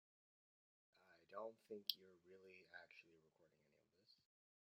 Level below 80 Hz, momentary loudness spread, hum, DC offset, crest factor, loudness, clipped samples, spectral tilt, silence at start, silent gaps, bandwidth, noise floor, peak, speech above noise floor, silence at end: under -90 dBFS; 18 LU; none; under 0.1%; 40 dB; -53 LUFS; under 0.1%; 0.5 dB/octave; 0.95 s; none; 7.2 kHz; -82 dBFS; -20 dBFS; 26 dB; 0.6 s